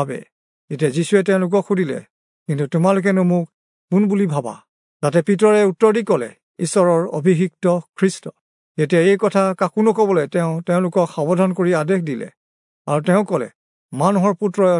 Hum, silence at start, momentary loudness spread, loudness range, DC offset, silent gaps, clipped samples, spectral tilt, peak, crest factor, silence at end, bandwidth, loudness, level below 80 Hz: none; 0 s; 15 LU; 3 LU; under 0.1%; 0.32-0.68 s, 2.10-2.46 s, 3.54-3.88 s, 4.68-5.00 s, 6.43-6.55 s, 8.41-8.75 s, 12.37-12.85 s, 13.55-13.89 s; under 0.1%; -7 dB/octave; -2 dBFS; 16 dB; 0 s; 11 kHz; -18 LUFS; -72 dBFS